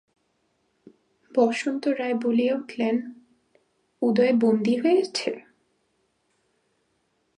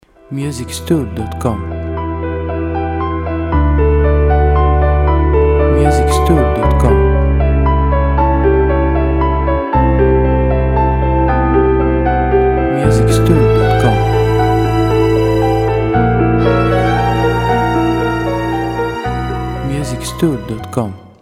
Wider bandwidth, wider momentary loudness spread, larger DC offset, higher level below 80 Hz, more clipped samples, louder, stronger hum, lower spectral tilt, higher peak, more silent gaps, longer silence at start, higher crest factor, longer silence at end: second, 10.5 kHz vs 14 kHz; about the same, 9 LU vs 9 LU; neither; second, -78 dBFS vs -18 dBFS; neither; second, -24 LUFS vs -13 LUFS; neither; second, -5.5 dB/octave vs -7.5 dB/octave; second, -8 dBFS vs 0 dBFS; neither; first, 1.35 s vs 0.3 s; first, 18 dB vs 12 dB; first, 2 s vs 0.15 s